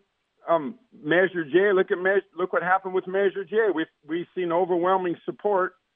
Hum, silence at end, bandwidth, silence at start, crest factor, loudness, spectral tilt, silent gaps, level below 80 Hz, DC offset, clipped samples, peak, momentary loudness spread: none; 0.25 s; 3.8 kHz; 0.45 s; 16 dB; -24 LUFS; -9.5 dB/octave; none; -82 dBFS; under 0.1%; under 0.1%; -8 dBFS; 9 LU